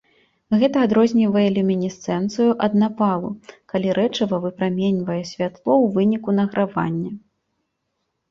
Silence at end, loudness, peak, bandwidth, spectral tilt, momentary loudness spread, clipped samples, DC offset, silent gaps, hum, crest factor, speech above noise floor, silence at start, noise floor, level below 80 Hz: 1.15 s; -20 LUFS; -4 dBFS; 7.4 kHz; -7 dB/octave; 10 LU; under 0.1%; under 0.1%; none; none; 16 dB; 55 dB; 0.5 s; -75 dBFS; -60 dBFS